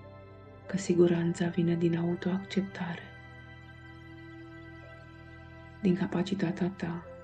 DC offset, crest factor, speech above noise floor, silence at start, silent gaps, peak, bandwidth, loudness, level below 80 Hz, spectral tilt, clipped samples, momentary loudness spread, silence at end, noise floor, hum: under 0.1%; 20 dB; 20 dB; 0 s; none; -12 dBFS; 9 kHz; -31 LUFS; -62 dBFS; -7 dB/octave; under 0.1%; 22 LU; 0 s; -50 dBFS; none